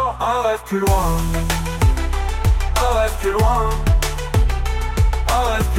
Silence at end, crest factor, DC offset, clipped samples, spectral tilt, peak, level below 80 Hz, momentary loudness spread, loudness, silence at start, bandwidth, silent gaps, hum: 0 s; 12 dB; under 0.1%; under 0.1%; -5 dB/octave; -4 dBFS; -20 dBFS; 3 LU; -19 LUFS; 0 s; 16.5 kHz; none; none